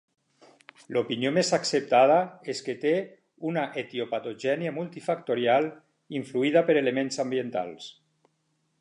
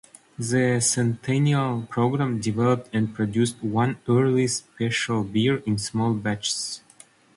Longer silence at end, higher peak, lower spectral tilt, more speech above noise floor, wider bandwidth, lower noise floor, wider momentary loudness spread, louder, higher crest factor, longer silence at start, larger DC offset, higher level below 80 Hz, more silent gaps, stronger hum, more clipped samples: first, 0.9 s vs 0.6 s; about the same, -8 dBFS vs -8 dBFS; about the same, -4.5 dB/octave vs -5 dB/octave; first, 47 dB vs 30 dB; about the same, 11 kHz vs 11.5 kHz; first, -74 dBFS vs -53 dBFS; first, 13 LU vs 6 LU; second, -27 LUFS vs -24 LUFS; about the same, 18 dB vs 14 dB; first, 0.9 s vs 0.4 s; neither; second, -80 dBFS vs -58 dBFS; neither; neither; neither